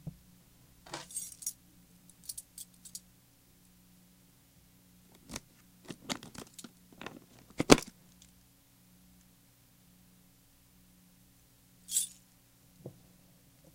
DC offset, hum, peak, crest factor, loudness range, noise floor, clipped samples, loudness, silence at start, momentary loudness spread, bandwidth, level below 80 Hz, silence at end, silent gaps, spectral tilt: under 0.1%; 60 Hz at -65 dBFS; 0 dBFS; 40 dB; 17 LU; -64 dBFS; under 0.1%; -35 LUFS; 0.05 s; 30 LU; 17 kHz; -60 dBFS; 0.85 s; none; -3 dB/octave